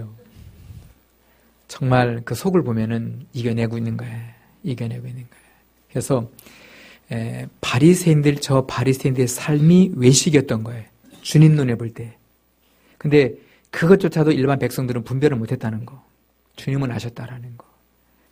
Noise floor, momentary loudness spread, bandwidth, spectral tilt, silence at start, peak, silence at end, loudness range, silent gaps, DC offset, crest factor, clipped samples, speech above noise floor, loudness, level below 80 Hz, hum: -61 dBFS; 19 LU; 15.5 kHz; -6 dB/octave; 0 s; 0 dBFS; 0.75 s; 11 LU; none; under 0.1%; 20 dB; under 0.1%; 42 dB; -19 LUFS; -52 dBFS; none